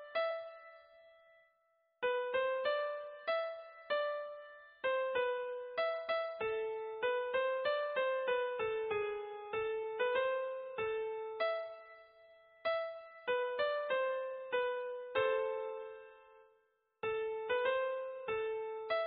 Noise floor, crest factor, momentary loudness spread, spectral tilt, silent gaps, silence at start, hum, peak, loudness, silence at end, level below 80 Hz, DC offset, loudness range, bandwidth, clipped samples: -77 dBFS; 16 dB; 10 LU; 1 dB/octave; none; 0 s; none; -22 dBFS; -37 LUFS; 0 s; -78 dBFS; under 0.1%; 3 LU; 5 kHz; under 0.1%